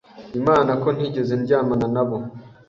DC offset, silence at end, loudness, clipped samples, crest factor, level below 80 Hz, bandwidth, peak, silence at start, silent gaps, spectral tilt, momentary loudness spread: under 0.1%; 0.2 s; -21 LUFS; under 0.1%; 18 dB; -52 dBFS; 7.4 kHz; -4 dBFS; 0.15 s; none; -8.5 dB/octave; 11 LU